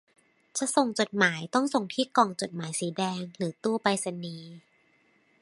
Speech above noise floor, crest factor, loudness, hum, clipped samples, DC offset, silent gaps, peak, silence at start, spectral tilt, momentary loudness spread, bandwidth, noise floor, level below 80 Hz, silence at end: 38 dB; 24 dB; -28 LUFS; none; under 0.1%; under 0.1%; none; -6 dBFS; 0.55 s; -4 dB/octave; 11 LU; 11.5 kHz; -66 dBFS; -76 dBFS; 0.85 s